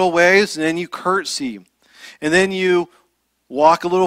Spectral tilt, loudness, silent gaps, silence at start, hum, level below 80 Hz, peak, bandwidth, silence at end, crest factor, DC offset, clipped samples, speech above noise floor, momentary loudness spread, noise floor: -4 dB/octave; -17 LUFS; none; 0 s; none; -58 dBFS; 0 dBFS; 15 kHz; 0 s; 18 dB; under 0.1%; under 0.1%; 48 dB; 16 LU; -65 dBFS